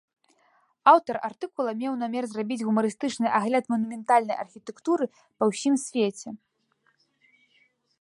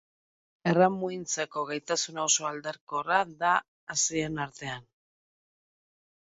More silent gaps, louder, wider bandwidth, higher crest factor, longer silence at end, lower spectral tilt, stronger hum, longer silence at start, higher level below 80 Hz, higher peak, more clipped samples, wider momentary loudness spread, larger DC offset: second, none vs 2.81-2.87 s, 3.68-3.87 s; first, -26 LUFS vs -29 LUFS; first, 11.5 kHz vs 8 kHz; about the same, 22 dB vs 20 dB; first, 1.65 s vs 1.4 s; first, -5 dB/octave vs -3 dB/octave; neither; first, 0.85 s vs 0.65 s; second, -78 dBFS vs -68 dBFS; first, -4 dBFS vs -10 dBFS; neither; about the same, 13 LU vs 11 LU; neither